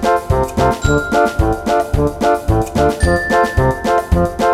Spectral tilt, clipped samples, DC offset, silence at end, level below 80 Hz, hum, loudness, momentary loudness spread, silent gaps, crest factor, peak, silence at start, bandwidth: -6 dB/octave; under 0.1%; under 0.1%; 0 s; -22 dBFS; none; -15 LUFS; 3 LU; none; 14 dB; 0 dBFS; 0 s; 16 kHz